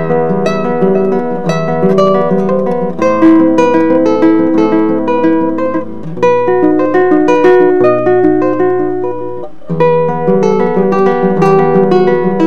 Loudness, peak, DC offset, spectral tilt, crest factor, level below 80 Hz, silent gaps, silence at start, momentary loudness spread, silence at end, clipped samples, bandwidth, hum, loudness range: -10 LUFS; 0 dBFS; 7%; -8 dB/octave; 10 dB; -48 dBFS; none; 0 s; 7 LU; 0 s; 0.2%; 7.2 kHz; none; 2 LU